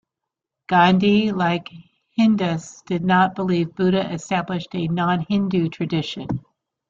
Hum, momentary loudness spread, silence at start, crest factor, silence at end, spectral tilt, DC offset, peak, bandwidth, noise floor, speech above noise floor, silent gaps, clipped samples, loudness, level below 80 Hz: none; 11 LU; 0.7 s; 18 dB; 0.5 s; -6.5 dB/octave; under 0.1%; -2 dBFS; 7.6 kHz; -84 dBFS; 64 dB; none; under 0.1%; -21 LUFS; -56 dBFS